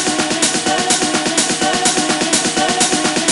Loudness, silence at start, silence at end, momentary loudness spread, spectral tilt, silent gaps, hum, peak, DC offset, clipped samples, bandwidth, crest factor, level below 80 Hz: -14 LUFS; 0 s; 0 s; 1 LU; -1.5 dB/octave; none; none; 0 dBFS; under 0.1%; under 0.1%; 12 kHz; 16 dB; -50 dBFS